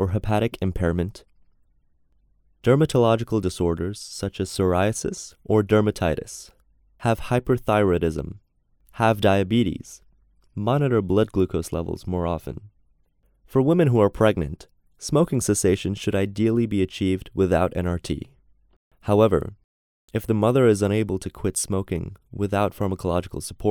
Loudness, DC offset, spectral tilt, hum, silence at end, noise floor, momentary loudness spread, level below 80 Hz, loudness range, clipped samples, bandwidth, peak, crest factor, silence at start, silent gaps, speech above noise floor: -23 LUFS; under 0.1%; -6 dB/octave; none; 0 s; -64 dBFS; 13 LU; -44 dBFS; 2 LU; under 0.1%; 18 kHz; -4 dBFS; 20 dB; 0 s; 18.76-18.91 s, 19.64-20.08 s; 42 dB